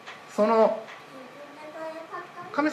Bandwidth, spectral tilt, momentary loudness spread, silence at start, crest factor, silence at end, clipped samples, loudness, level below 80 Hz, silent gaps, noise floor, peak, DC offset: 12.5 kHz; -5.5 dB/octave; 22 LU; 0.05 s; 20 dB; 0 s; under 0.1%; -26 LUFS; -82 dBFS; none; -44 dBFS; -8 dBFS; under 0.1%